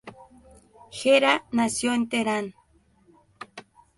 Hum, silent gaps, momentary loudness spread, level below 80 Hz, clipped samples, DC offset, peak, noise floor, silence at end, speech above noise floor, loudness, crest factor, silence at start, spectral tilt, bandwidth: none; none; 23 LU; -64 dBFS; under 0.1%; under 0.1%; -4 dBFS; -61 dBFS; 0.4 s; 38 dB; -23 LUFS; 22 dB; 0.05 s; -3 dB/octave; 11.5 kHz